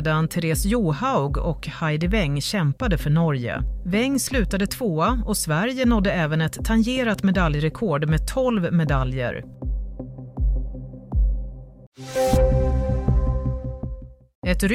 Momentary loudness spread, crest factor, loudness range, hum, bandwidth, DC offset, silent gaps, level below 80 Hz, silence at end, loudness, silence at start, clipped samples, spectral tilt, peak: 12 LU; 14 dB; 4 LU; none; 16 kHz; under 0.1%; 11.87-11.92 s, 14.35-14.42 s; -28 dBFS; 0 s; -23 LUFS; 0 s; under 0.1%; -6 dB/octave; -6 dBFS